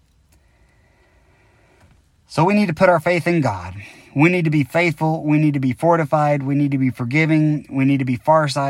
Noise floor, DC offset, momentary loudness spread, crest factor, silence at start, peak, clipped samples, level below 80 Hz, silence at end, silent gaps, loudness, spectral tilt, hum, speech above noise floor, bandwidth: -56 dBFS; under 0.1%; 6 LU; 16 dB; 2.3 s; -2 dBFS; under 0.1%; -54 dBFS; 0 s; none; -18 LUFS; -7.5 dB/octave; none; 39 dB; 12.5 kHz